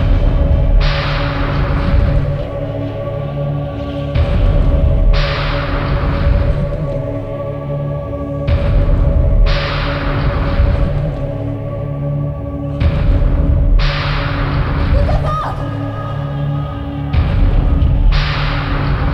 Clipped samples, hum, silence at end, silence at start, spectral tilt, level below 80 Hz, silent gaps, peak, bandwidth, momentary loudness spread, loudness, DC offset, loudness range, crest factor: under 0.1%; none; 0 s; 0 s; -8.5 dB/octave; -16 dBFS; none; -2 dBFS; 6 kHz; 7 LU; -17 LUFS; under 0.1%; 2 LU; 12 dB